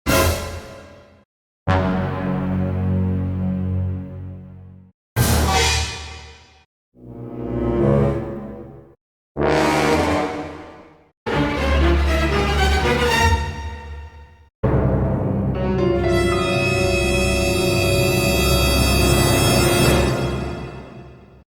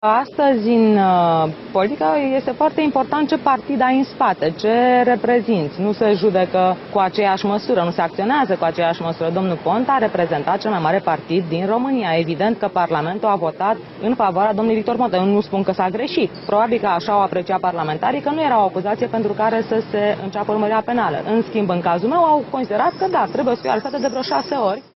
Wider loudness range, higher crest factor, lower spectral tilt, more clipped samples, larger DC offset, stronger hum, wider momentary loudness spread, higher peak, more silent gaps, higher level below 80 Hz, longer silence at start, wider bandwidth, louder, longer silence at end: first, 6 LU vs 2 LU; about the same, 16 dB vs 18 dB; second, -5 dB/octave vs -7.5 dB/octave; neither; neither; neither; first, 18 LU vs 5 LU; about the same, -2 dBFS vs 0 dBFS; first, 1.25-1.66 s, 4.94-5.16 s, 6.66-6.92 s, 9.01-9.35 s, 11.17-11.26 s, 14.55-14.63 s vs none; first, -28 dBFS vs -58 dBFS; about the same, 0.05 s vs 0 s; first, 20 kHz vs 6 kHz; about the same, -19 LUFS vs -18 LUFS; first, 0.35 s vs 0.15 s